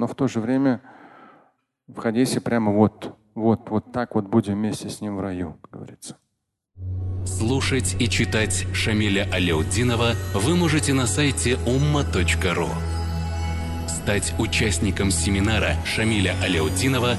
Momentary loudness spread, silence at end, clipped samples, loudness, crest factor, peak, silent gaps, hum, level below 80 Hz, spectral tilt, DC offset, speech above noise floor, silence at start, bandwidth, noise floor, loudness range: 9 LU; 0 s; under 0.1%; -22 LUFS; 18 dB; -4 dBFS; none; none; -34 dBFS; -5 dB/octave; under 0.1%; 55 dB; 0 s; 12.5 kHz; -77 dBFS; 6 LU